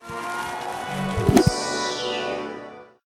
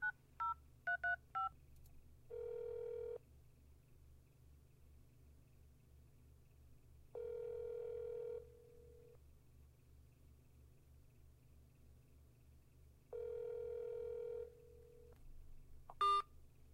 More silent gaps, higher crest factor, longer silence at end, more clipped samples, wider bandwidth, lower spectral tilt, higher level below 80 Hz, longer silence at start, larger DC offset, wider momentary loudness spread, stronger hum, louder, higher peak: neither; about the same, 24 dB vs 20 dB; first, 0.2 s vs 0 s; neither; about the same, 17.5 kHz vs 16 kHz; about the same, -5 dB/octave vs -4 dB/octave; first, -40 dBFS vs -66 dBFS; about the same, 0 s vs 0 s; neither; second, 14 LU vs 26 LU; neither; first, -24 LUFS vs -45 LUFS; first, -2 dBFS vs -28 dBFS